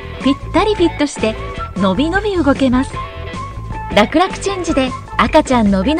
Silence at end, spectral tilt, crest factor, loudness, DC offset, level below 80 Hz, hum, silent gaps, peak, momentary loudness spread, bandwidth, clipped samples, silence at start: 0 s; -5.5 dB/octave; 16 dB; -15 LUFS; under 0.1%; -30 dBFS; none; none; 0 dBFS; 13 LU; 10.5 kHz; 0.1%; 0 s